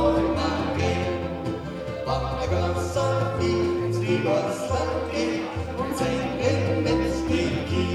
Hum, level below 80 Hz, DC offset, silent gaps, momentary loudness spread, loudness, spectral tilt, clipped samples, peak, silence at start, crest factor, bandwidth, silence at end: none; -40 dBFS; under 0.1%; none; 6 LU; -25 LUFS; -6.5 dB/octave; under 0.1%; -8 dBFS; 0 s; 16 dB; 13 kHz; 0 s